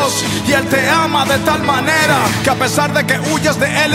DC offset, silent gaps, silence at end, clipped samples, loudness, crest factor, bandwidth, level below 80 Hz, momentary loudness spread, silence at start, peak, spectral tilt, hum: under 0.1%; none; 0 s; under 0.1%; -13 LUFS; 14 dB; 16.5 kHz; -42 dBFS; 3 LU; 0 s; 0 dBFS; -3.5 dB/octave; none